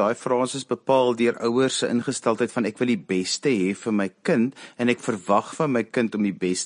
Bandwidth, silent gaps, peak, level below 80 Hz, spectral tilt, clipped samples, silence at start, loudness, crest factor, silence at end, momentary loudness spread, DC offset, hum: 10.5 kHz; none; -6 dBFS; -66 dBFS; -4.5 dB/octave; under 0.1%; 0 s; -23 LUFS; 18 dB; 0 s; 4 LU; under 0.1%; none